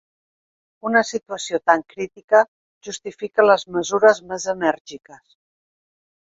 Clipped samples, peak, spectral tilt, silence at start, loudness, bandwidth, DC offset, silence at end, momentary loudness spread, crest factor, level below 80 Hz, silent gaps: under 0.1%; 0 dBFS; -3 dB/octave; 0.85 s; -19 LUFS; 8 kHz; under 0.1%; 1.3 s; 16 LU; 22 dB; -66 dBFS; 2.24-2.28 s, 2.48-2.81 s, 4.80-4.85 s